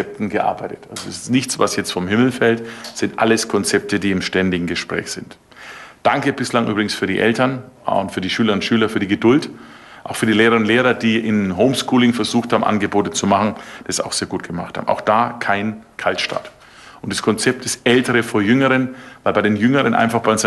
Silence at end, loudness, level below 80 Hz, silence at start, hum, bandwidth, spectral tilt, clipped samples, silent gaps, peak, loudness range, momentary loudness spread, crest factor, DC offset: 0 s; -18 LUFS; -50 dBFS; 0 s; none; 12.5 kHz; -4.5 dB/octave; under 0.1%; none; -2 dBFS; 4 LU; 12 LU; 16 dB; under 0.1%